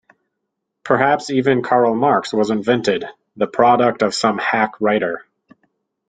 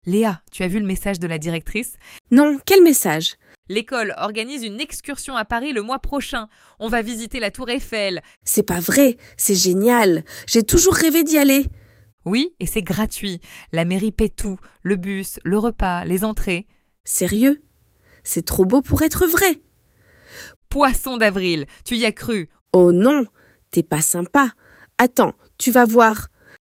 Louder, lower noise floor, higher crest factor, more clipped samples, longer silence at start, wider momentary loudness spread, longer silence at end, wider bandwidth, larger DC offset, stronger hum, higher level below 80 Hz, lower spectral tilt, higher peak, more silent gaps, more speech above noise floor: about the same, -17 LUFS vs -19 LUFS; first, -77 dBFS vs -56 dBFS; about the same, 16 dB vs 18 dB; neither; first, 0.85 s vs 0.05 s; second, 9 LU vs 13 LU; first, 0.9 s vs 0.35 s; second, 9.4 kHz vs 16.5 kHz; neither; neither; second, -60 dBFS vs -36 dBFS; about the same, -5 dB/octave vs -4 dB/octave; about the same, -2 dBFS vs -2 dBFS; second, none vs 2.21-2.25 s, 3.58-3.63 s, 8.37-8.41 s, 12.13-12.18 s, 17.00-17.04 s, 20.56-20.62 s, 22.61-22.66 s; first, 60 dB vs 38 dB